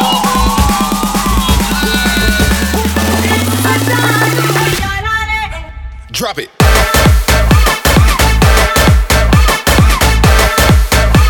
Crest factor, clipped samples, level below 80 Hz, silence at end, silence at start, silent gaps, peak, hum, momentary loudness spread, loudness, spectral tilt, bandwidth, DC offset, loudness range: 10 dB; under 0.1%; -14 dBFS; 0 s; 0 s; none; 0 dBFS; none; 6 LU; -10 LUFS; -4 dB/octave; 19.5 kHz; under 0.1%; 4 LU